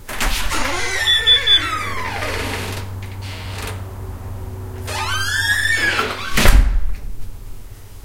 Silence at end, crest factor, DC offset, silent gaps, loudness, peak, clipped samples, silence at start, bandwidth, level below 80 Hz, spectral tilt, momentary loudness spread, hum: 0.05 s; 18 dB; under 0.1%; none; -17 LUFS; 0 dBFS; under 0.1%; 0 s; 16.5 kHz; -24 dBFS; -2.5 dB/octave; 19 LU; none